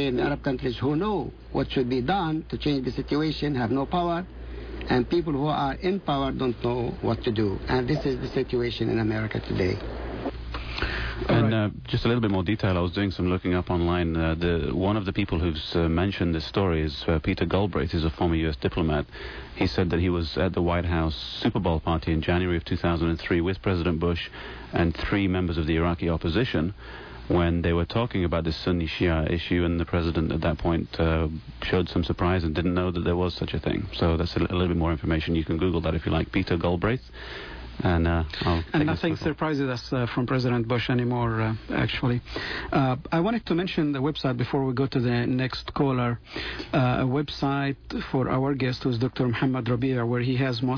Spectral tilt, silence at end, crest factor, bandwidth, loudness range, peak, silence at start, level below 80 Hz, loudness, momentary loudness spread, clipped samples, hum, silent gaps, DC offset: -8 dB/octave; 0 s; 14 dB; 5.4 kHz; 1 LU; -12 dBFS; 0 s; -38 dBFS; -26 LUFS; 5 LU; under 0.1%; none; none; under 0.1%